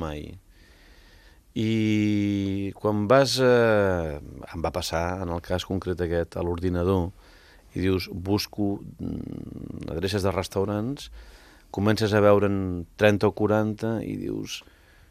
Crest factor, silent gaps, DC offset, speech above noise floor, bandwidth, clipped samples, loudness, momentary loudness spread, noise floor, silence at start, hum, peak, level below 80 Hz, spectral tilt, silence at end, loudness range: 24 dB; none; under 0.1%; 29 dB; 15 kHz; under 0.1%; -25 LUFS; 17 LU; -53 dBFS; 0 s; none; -2 dBFS; -50 dBFS; -6 dB/octave; 0.5 s; 6 LU